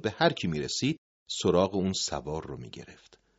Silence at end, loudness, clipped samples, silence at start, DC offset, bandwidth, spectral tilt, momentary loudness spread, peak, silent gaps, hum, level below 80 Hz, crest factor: 0.45 s; -29 LUFS; under 0.1%; 0 s; under 0.1%; 8 kHz; -4 dB/octave; 16 LU; -8 dBFS; 0.98-1.26 s; none; -58 dBFS; 22 dB